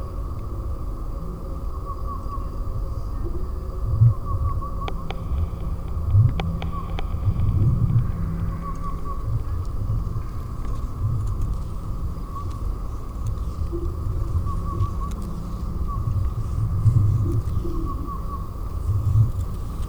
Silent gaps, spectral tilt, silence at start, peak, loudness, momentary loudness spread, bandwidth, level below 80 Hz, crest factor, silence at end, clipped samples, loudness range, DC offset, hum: none; -8.5 dB/octave; 0 s; -6 dBFS; -26 LUFS; 12 LU; 16.5 kHz; -28 dBFS; 18 dB; 0 s; under 0.1%; 6 LU; under 0.1%; none